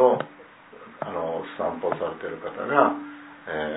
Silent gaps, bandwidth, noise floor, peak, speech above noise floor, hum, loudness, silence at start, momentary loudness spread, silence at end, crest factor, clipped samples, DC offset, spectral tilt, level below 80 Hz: none; 4 kHz; -48 dBFS; -4 dBFS; 22 dB; none; -27 LUFS; 0 s; 20 LU; 0 s; 24 dB; under 0.1%; under 0.1%; -10 dB/octave; -64 dBFS